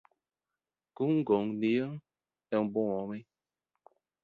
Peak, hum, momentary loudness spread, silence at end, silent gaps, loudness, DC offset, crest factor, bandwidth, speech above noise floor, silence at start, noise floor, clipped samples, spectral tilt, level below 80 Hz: -16 dBFS; none; 13 LU; 1 s; none; -32 LUFS; under 0.1%; 18 dB; 4.8 kHz; over 60 dB; 1 s; under -90 dBFS; under 0.1%; -9.5 dB/octave; -74 dBFS